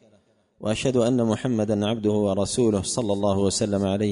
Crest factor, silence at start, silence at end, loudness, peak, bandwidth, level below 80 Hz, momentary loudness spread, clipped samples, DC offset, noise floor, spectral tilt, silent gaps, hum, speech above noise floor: 14 dB; 0.6 s; 0 s; -23 LUFS; -10 dBFS; 11 kHz; -52 dBFS; 3 LU; under 0.1%; under 0.1%; -61 dBFS; -5.5 dB/octave; none; none; 39 dB